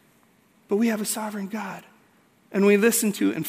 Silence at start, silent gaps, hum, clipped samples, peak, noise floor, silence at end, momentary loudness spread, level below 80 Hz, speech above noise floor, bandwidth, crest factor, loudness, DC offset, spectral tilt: 0.7 s; none; none; under 0.1%; -6 dBFS; -60 dBFS; 0 s; 15 LU; -76 dBFS; 37 dB; 16 kHz; 18 dB; -23 LUFS; under 0.1%; -4.5 dB/octave